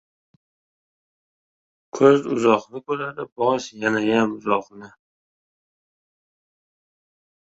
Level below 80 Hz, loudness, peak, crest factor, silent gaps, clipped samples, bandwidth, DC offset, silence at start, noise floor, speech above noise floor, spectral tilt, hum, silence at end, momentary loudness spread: -66 dBFS; -21 LUFS; -2 dBFS; 22 dB; 3.32-3.36 s; under 0.1%; 8 kHz; under 0.1%; 1.95 s; under -90 dBFS; over 69 dB; -5.5 dB/octave; none; 2.55 s; 11 LU